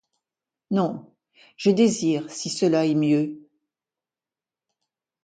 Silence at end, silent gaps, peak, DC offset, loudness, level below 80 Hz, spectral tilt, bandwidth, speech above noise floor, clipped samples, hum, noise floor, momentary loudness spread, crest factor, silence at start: 1.85 s; none; -6 dBFS; under 0.1%; -23 LUFS; -70 dBFS; -5.5 dB/octave; 9.4 kHz; over 68 dB; under 0.1%; none; under -90 dBFS; 9 LU; 18 dB; 0.7 s